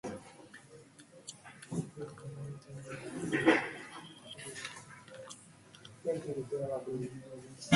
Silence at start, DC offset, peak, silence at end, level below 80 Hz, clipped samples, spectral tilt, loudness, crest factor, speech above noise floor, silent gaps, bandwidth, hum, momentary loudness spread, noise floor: 0.05 s; under 0.1%; -10 dBFS; 0 s; -70 dBFS; under 0.1%; -5 dB/octave; -37 LUFS; 28 dB; 21 dB; none; 11.5 kHz; none; 23 LU; -57 dBFS